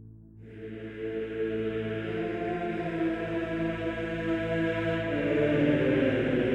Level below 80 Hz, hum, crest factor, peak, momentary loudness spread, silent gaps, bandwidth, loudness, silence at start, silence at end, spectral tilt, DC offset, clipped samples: -52 dBFS; none; 16 dB; -14 dBFS; 11 LU; none; 8.4 kHz; -29 LUFS; 0 s; 0 s; -8 dB/octave; under 0.1%; under 0.1%